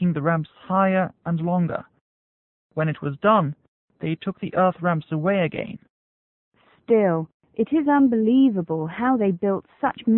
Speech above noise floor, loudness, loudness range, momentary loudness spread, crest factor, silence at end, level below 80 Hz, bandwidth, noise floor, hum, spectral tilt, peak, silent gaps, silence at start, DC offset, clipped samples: over 69 dB; -22 LUFS; 5 LU; 12 LU; 16 dB; 0 s; -62 dBFS; 4 kHz; under -90 dBFS; none; -12.5 dB/octave; -6 dBFS; 2.01-2.70 s, 3.68-3.88 s, 5.90-6.52 s, 7.34-7.40 s; 0 s; under 0.1%; under 0.1%